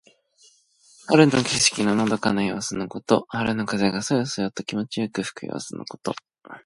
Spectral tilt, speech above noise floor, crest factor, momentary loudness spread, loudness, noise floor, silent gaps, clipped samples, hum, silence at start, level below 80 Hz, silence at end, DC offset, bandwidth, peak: -4 dB/octave; 35 dB; 22 dB; 14 LU; -23 LUFS; -58 dBFS; none; under 0.1%; none; 1.05 s; -58 dBFS; 0.05 s; under 0.1%; 11.5 kHz; -2 dBFS